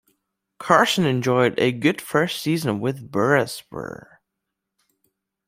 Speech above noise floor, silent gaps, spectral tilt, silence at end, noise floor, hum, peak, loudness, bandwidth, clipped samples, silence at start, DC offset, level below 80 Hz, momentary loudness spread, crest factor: 60 dB; none; -5 dB/octave; 1.55 s; -81 dBFS; none; -2 dBFS; -20 LUFS; 16 kHz; under 0.1%; 0.6 s; under 0.1%; -62 dBFS; 16 LU; 22 dB